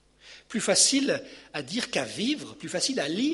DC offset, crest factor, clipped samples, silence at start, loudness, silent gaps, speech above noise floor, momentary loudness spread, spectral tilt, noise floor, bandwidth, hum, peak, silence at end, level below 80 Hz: under 0.1%; 20 dB; under 0.1%; 0.25 s; -26 LUFS; none; 25 dB; 14 LU; -2 dB/octave; -52 dBFS; 11.5 kHz; none; -8 dBFS; 0 s; -68 dBFS